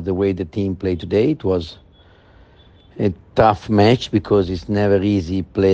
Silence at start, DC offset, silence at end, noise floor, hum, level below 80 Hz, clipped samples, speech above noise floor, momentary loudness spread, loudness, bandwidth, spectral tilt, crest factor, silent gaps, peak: 0 s; under 0.1%; 0 s; -49 dBFS; none; -42 dBFS; under 0.1%; 31 dB; 8 LU; -18 LUFS; 8 kHz; -7.5 dB/octave; 18 dB; none; 0 dBFS